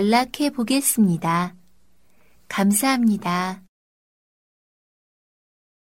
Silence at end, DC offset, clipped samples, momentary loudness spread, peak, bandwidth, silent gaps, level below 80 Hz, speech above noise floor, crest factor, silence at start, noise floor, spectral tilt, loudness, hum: 2.3 s; 0.2%; under 0.1%; 11 LU; -6 dBFS; 16.5 kHz; none; -62 dBFS; 43 dB; 18 dB; 0 s; -63 dBFS; -4.5 dB/octave; -21 LUFS; none